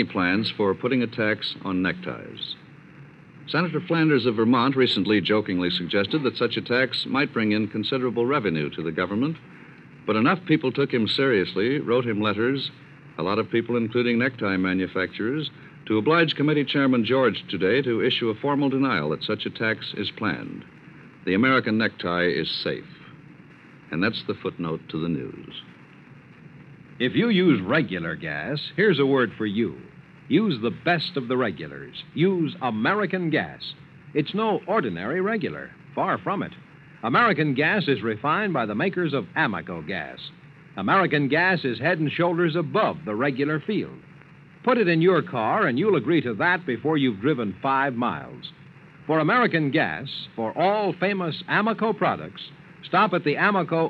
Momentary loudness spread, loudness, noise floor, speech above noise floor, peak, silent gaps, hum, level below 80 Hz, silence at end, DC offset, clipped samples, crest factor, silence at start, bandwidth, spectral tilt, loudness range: 13 LU; -23 LUFS; -48 dBFS; 25 dB; -6 dBFS; none; none; -64 dBFS; 0 s; under 0.1%; under 0.1%; 18 dB; 0 s; 8.4 kHz; -8 dB/octave; 4 LU